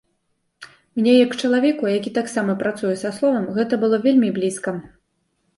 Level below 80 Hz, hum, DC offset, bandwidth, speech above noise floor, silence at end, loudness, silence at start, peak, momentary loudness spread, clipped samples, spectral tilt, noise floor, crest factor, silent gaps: -64 dBFS; none; under 0.1%; 11.5 kHz; 51 dB; 0.7 s; -20 LUFS; 0.6 s; -4 dBFS; 8 LU; under 0.1%; -5.5 dB/octave; -70 dBFS; 16 dB; none